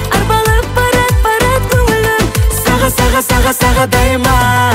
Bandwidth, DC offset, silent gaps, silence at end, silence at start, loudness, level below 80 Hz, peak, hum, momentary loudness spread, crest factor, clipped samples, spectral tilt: 16.5 kHz; under 0.1%; none; 0 s; 0 s; -11 LUFS; -16 dBFS; 0 dBFS; none; 2 LU; 10 dB; under 0.1%; -4.5 dB/octave